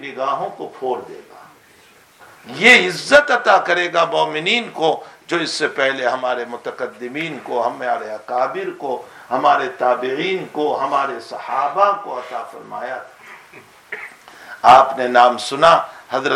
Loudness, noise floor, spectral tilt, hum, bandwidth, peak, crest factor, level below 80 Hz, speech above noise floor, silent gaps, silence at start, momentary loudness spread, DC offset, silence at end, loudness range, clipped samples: -17 LUFS; -49 dBFS; -3 dB/octave; none; 14 kHz; 0 dBFS; 18 dB; -60 dBFS; 32 dB; none; 0 s; 18 LU; under 0.1%; 0 s; 8 LU; under 0.1%